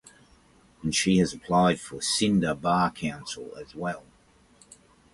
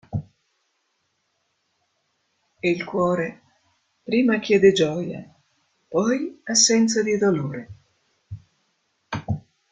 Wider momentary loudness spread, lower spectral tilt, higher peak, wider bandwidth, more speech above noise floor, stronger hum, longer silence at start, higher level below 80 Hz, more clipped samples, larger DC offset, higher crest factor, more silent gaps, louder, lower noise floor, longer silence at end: second, 14 LU vs 21 LU; about the same, -4.5 dB/octave vs -4 dB/octave; second, -10 dBFS vs -2 dBFS; first, 11.5 kHz vs 9.6 kHz; second, 34 dB vs 52 dB; neither; first, 0.85 s vs 0.1 s; about the same, -54 dBFS vs -58 dBFS; neither; neither; about the same, 18 dB vs 22 dB; neither; second, -26 LUFS vs -21 LUFS; second, -60 dBFS vs -72 dBFS; first, 1.15 s vs 0.35 s